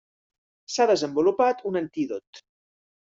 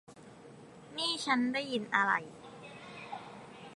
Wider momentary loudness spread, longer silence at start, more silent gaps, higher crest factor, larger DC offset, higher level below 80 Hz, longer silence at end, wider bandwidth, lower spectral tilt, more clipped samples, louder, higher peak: second, 10 LU vs 24 LU; first, 0.7 s vs 0.1 s; first, 2.27-2.33 s vs none; second, 16 dB vs 24 dB; neither; first, -70 dBFS vs -78 dBFS; first, 0.75 s vs 0.05 s; second, 7.8 kHz vs 11.5 kHz; first, -4.5 dB/octave vs -3 dB/octave; neither; first, -24 LUFS vs -32 LUFS; about the same, -10 dBFS vs -12 dBFS